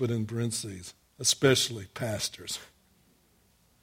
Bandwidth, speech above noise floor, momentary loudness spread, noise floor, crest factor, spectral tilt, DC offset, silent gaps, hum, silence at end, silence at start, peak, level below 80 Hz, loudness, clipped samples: 16.5 kHz; 36 dB; 16 LU; -66 dBFS; 24 dB; -3.5 dB/octave; under 0.1%; none; none; 1.15 s; 0 s; -8 dBFS; -64 dBFS; -29 LUFS; under 0.1%